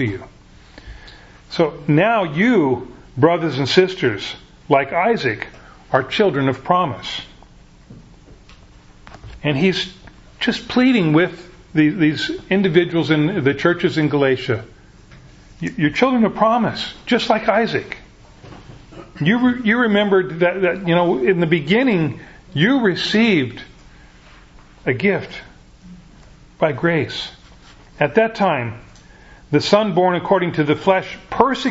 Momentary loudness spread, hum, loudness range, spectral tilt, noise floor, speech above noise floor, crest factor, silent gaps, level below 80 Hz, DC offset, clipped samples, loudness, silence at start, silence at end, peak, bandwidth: 12 LU; none; 6 LU; -6.5 dB/octave; -45 dBFS; 28 dB; 18 dB; none; -48 dBFS; under 0.1%; under 0.1%; -18 LUFS; 0 s; 0 s; 0 dBFS; 8 kHz